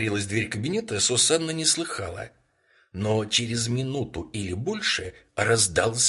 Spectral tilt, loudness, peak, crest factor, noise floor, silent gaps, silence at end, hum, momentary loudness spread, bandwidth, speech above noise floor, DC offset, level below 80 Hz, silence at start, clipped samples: -3 dB/octave; -24 LUFS; -8 dBFS; 18 dB; -64 dBFS; none; 0 s; none; 12 LU; 11.5 kHz; 38 dB; under 0.1%; -50 dBFS; 0 s; under 0.1%